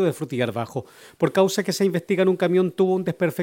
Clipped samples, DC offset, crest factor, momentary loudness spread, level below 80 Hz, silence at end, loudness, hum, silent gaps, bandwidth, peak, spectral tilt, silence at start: under 0.1%; under 0.1%; 18 dB; 6 LU; -68 dBFS; 0 s; -22 LUFS; none; none; 17 kHz; -4 dBFS; -6 dB/octave; 0 s